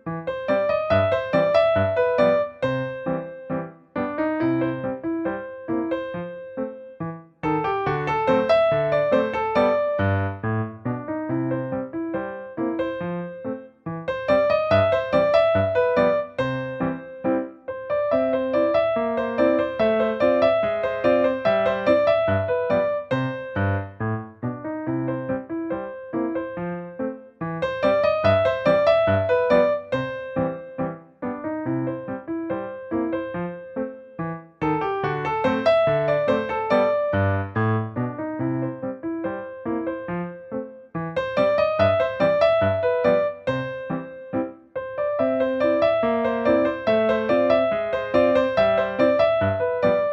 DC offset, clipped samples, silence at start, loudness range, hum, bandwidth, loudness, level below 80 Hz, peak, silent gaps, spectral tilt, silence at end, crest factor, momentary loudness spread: under 0.1%; under 0.1%; 0.05 s; 8 LU; none; 7 kHz; -23 LUFS; -54 dBFS; -6 dBFS; none; -8 dB/octave; 0 s; 16 dB; 12 LU